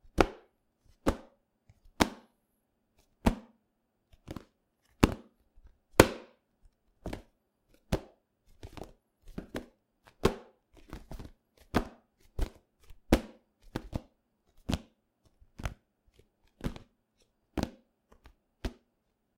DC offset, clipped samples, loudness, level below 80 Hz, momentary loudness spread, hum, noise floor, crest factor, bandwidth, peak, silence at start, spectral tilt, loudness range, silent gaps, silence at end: under 0.1%; under 0.1%; -33 LUFS; -44 dBFS; 20 LU; none; -78 dBFS; 36 dB; 16.5 kHz; 0 dBFS; 0.15 s; -5 dB/octave; 12 LU; none; 0.65 s